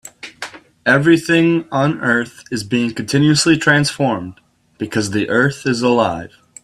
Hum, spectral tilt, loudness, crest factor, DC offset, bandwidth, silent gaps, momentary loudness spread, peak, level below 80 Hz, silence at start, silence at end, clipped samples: none; -5 dB/octave; -16 LUFS; 16 dB; under 0.1%; 13.5 kHz; none; 18 LU; 0 dBFS; -52 dBFS; 0.05 s; 0.35 s; under 0.1%